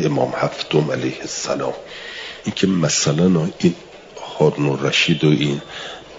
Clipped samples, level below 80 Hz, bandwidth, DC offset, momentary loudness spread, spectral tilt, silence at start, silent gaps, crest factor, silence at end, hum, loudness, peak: under 0.1%; -54 dBFS; 7.8 kHz; under 0.1%; 15 LU; -4.5 dB/octave; 0 s; none; 16 dB; 0 s; none; -19 LUFS; -2 dBFS